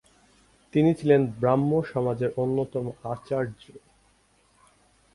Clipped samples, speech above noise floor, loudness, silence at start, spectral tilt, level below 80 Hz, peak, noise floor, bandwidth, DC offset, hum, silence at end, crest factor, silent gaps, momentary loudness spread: under 0.1%; 39 dB; -25 LUFS; 0.75 s; -9 dB/octave; -60 dBFS; -6 dBFS; -63 dBFS; 11.5 kHz; under 0.1%; none; 1.35 s; 20 dB; none; 11 LU